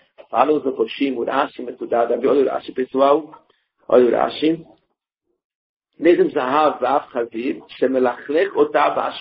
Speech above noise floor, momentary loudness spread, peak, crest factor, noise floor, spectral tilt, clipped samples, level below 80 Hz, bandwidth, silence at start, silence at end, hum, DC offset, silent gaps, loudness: 57 dB; 9 LU; 0 dBFS; 20 dB; -75 dBFS; -3.5 dB/octave; under 0.1%; -64 dBFS; 5.6 kHz; 0.3 s; 0 s; none; under 0.1%; 5.45-5.80 s; -19 LUFS